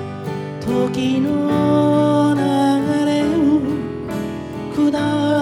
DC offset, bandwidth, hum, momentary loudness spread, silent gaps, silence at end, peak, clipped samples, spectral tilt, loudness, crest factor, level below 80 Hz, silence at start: under 0.1%; 12.5 kHz; none; 10 LU; none; 0 s; -4 dBFS; under 0.1%; -7 dB/octave; -18 LUFS; 14 dB; -48 dBFS; 0 s